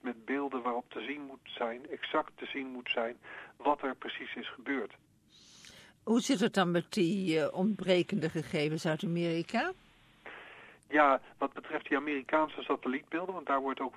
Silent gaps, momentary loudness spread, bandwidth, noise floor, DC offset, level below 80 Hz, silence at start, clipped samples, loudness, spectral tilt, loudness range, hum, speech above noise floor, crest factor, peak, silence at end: none; 18 LU; 14 kHz; -61 dBFS; under 0.1%; -74 dBFS; 0.05 s; under 0.1%; -33 LUFS; -5.5 dB/octave; 6 LU; none; 28 dB; 22 dB; -12 dBFS; 0 s